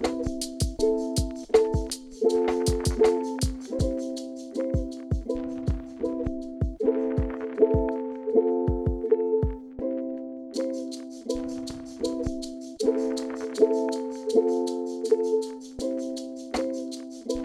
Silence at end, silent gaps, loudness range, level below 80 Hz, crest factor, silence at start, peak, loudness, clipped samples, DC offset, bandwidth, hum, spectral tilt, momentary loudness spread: 0 s; none; 5 LU; -38 dBFS; 20 dB; 0 s; -6 dBFS; -28 LUFS; under 0.1%; under 0.1%; 13.5 kHz; none; -6 dB/octave; 11 LU